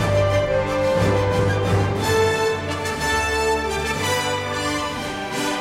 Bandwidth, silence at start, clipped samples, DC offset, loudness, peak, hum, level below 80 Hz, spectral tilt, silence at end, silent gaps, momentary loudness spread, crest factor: 16 kHz; 0 s; under 0.1%; under 0.1%; -21 LUFS; -8 dBFS; none; -38 dBFS; -4.5 dB/octave; 0 s; none; 6 LU; 14 dB